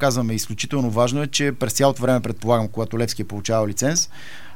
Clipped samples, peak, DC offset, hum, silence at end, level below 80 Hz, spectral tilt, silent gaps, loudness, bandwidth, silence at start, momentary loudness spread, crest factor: under 0.1%; -4 dBFS; 3%; none; 0.05 s; -56 dBFS; -4.5 dB/octave; none; -21 LUFS; 17 kHz; 0 s; 6 LU; 18 dB